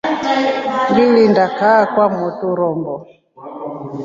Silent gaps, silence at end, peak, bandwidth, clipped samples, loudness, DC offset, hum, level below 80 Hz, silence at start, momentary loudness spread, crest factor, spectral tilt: none; 0 s; -2 dBFS; 7.6 kHz; under 0.1%; -14 LUFS; under 0.1%; none; -56 dBFS; 0.05 s; 17 LU; 14 dB; -6.5 dB/octave